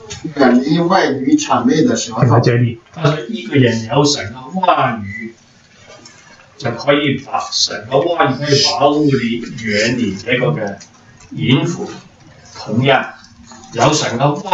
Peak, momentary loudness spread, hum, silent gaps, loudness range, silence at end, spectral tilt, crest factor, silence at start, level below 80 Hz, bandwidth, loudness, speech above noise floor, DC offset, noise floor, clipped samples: 0 dBFS; 13 LU; none; none; 5 LU; 0 s; -5 dB/octave; 16 dB; 0 s; -50 dBFS; 8.2 kHz; -15 LUFS; 32 dB; under 0.1%; -46 dBFS; under 0.1%